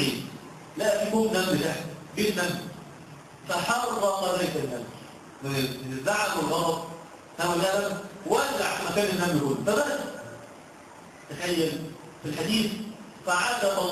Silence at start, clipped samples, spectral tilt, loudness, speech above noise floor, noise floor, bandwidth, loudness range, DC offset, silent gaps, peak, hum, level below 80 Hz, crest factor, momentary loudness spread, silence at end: 0 s; under 0.1%; -4 dB/octave; -27 LUFS; 21 dB; -47 dBFS; 14.5 kHz; 3 LU; under 0.1%; none; -10 dBFS; none; -60 dBFS; 18 dB; 19 LU; 0 s